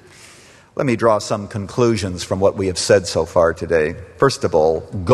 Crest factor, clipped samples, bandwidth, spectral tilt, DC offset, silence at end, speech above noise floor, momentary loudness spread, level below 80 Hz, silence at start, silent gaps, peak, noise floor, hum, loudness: 18 dB; under 0.1%; 12.5 kHz; -5 dB/octave; under 0.1%; 0 s; 28 dB; 8 LU; -44 dBFS; 0.75 s; none; 0 dBFS; -45 dBFS; none; -18 LUFS